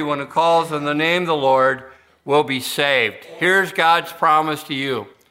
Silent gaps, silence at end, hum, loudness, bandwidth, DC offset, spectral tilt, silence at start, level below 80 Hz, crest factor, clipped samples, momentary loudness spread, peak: none; 0.25 s; none; -18 LUFS; 16 kHz; under 0.1%; -4 dB/octave; 0 s; -66 dBFS; 16 dB; under 0.1%; 7 LU; -2 dBFS